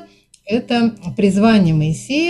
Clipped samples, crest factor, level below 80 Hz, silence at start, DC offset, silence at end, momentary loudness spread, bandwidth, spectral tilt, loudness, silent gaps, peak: under 0.1%; 14 dB; -44 dBFS; 0 s; under 0.1%; 0 s; 8 LU; 11.5 kHz; -6.5 dB/octave; -16 LUFS; none; -2 dBFS